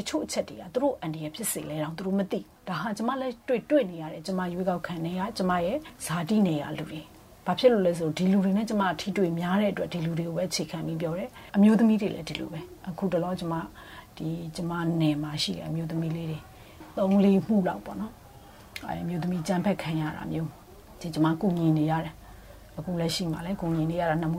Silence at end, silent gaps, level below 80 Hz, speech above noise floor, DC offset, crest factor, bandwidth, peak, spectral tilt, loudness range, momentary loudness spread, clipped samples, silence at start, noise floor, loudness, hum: 0 s; none; -56 dBFS; 22 dB; under 0.1%; 18 dB; 16 kHz; -8 dBFS; -6 dB/octave; 5 LU; 14 LU; under 0.1%; 0 s; -49 dBFS; -28 LUFS; none